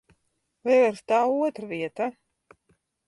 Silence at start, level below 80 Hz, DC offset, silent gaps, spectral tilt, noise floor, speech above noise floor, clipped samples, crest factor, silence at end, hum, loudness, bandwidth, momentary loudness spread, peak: 0.65 s; -74 dBFS; under 0.1%; none; -5.5 dB/octave; -75 dBFS; 51 dB; under 0.1%; 16 dB; 0.95 s; none; -25 LUFS; 11.5 kHz; 12 LU; -10 dBFS